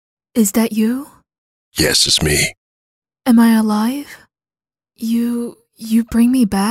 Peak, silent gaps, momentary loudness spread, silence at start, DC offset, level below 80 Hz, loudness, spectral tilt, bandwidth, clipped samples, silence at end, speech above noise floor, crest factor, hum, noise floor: -2 dBFS; 1.38-1.72 s, 2.57-3.02 s; 15 LU; 0.35 s; under 0.1%; -42 dBFS; -15 LUFS; -3.5 dB/octave; 16 kHz; under 0.1%; 0 s; over 75 dB; 16 dB; none; under -90 dBFS